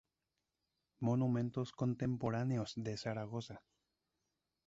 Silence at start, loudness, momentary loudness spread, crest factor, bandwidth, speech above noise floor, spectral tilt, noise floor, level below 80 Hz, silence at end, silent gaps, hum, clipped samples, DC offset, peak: 1 s; -39 LUFS; 10 LU; 18 dB; 7.8 kHz; 51 dB; -7.5 dB/octave; -89 dBFS; -70 dBFS; 1.1 s; none; none; under 0.1%; under 0.1%; -22 dBFS